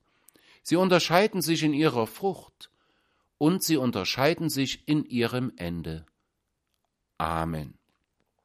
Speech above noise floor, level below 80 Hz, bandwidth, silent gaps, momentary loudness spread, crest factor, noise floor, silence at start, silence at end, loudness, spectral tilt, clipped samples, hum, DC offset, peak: 53 dB; -54 dBFS; 15.5 kHz; none; 14 LU; 22 dB; -79 dBFS; 0.65 s; 0.7 s; -26 LUFS; -5 dB/octave; under 0.1%; none; under 0.1%; -4 dBFS